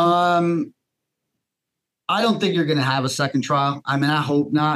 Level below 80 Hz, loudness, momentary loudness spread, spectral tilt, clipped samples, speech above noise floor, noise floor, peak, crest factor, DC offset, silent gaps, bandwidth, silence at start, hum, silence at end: -72 dBFS; -20 LUFS; 6 LU; -5.5 dB/octave; under 0.1%; 63 dB; -83 dBFS; -6 dBFS; 14 dB; under 0.1%; none; 13 kHz; 0 s; none; 0 s